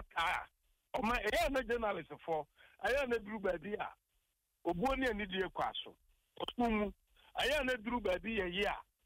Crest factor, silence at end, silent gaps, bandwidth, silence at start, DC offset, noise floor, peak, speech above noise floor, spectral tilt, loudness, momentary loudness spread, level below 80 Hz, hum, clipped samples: 14 dB; 0.25 s; none; 16 kHz; 0 s; under 0.1%; -82 dBFS; -24 dBFS; 45 dB; -4.5 dB/octave; -37 LUFS; 10 LU; -54 dBFS; none; under 0.1%